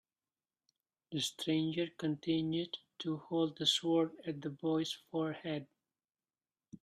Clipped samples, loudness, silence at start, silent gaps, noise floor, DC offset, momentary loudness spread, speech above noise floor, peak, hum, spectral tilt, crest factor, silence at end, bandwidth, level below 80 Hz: under 0.1%; -36 LUFS; 1.1 s; none; under -90 dBFS; under 0.1%; 11 LU; over 54 dB; -18 dBFS; none; -5 dB/octave; 20 dB; 0.1 s; 13 kHz; -78 dBFS